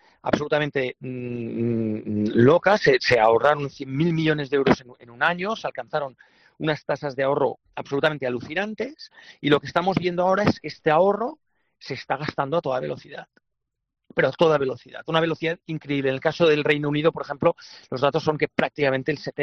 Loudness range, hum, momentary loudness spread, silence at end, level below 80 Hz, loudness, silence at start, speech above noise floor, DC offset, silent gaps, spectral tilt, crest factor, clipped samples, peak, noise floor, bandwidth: 6 LU; none; 13 LU; 0 s; -58 dBFS; -23 LUFS; 0.25 s; 58 dB; under 0.1%; none; -4.5 dB/octave; 18 dB; under 0.1%; -4 dBFS; -81 dBFS; 7.8 kHz